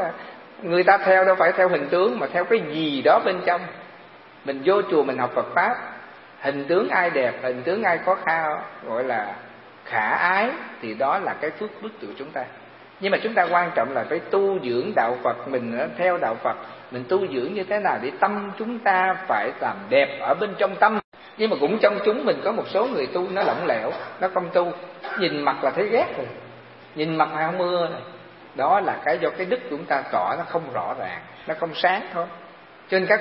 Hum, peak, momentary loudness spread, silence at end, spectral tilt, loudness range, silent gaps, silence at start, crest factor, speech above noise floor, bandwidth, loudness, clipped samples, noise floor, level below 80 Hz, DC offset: none; -2 dBFS; 13 LU; 0 s; -9.5 dB/octave; 3 LU; 21.04-21.12 s; 0 s; 20 dB; 24 dB; 5.8 kHz; -23 LUFS; under 0.1%; -46 dBFS; -74 dBFS; under 0.1%